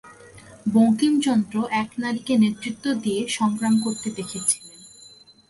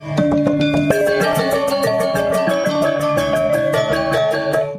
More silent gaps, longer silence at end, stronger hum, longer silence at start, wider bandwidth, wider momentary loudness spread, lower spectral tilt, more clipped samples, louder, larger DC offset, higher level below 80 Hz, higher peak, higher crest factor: neither; first, 0.6 s vs 0 s; neither; about the same, 0.05 s vs 0 s; second, 11.5 kHz vs 15.5 kHz; first, 9 LU vs 2 LU; second, -4 dB/octave vs -5.5 dB/octave; neither; second, -22 LUFS vs -17 LUFS; neither; second, -62 dBFS vs -44 dBFS; second, -8 dBFS vs -2 dBFS; about the same, 16 dB vs 16 dB